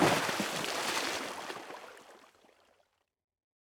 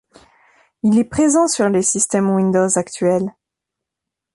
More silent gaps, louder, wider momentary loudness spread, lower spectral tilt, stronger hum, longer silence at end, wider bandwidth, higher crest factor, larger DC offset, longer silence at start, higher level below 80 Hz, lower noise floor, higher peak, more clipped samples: neither; second, -34 LUFS vs -16 LUFS; first, 18 LU vs 5 LU; second, -3 dB/octave vs -5 dB/octave; neither; first, 1.5 s vs 1.05 s; first, over 20 kHz vs 11.5 kHz; first, 22 dB vs 16 dB; neither; second, 0 s vs 0.85 s; second, -72 dBFS vs -52 dBFS; second, -75 dBFS vs -83 dBFS; second, -14 dBFS vs -2 dBFS; neither